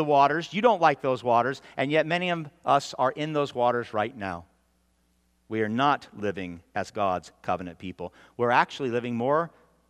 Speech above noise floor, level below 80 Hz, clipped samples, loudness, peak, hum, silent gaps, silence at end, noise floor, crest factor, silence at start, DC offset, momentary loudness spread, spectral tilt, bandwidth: 42 dB; -68 dBFS; under 0.1%; -26 LUFS; -6 dBFS; none; none; 0.4 s; -68 dBFS; 20 dB; 0 s; under 0.1%; 13 LU; -5.5 dB/octave; 12 kHz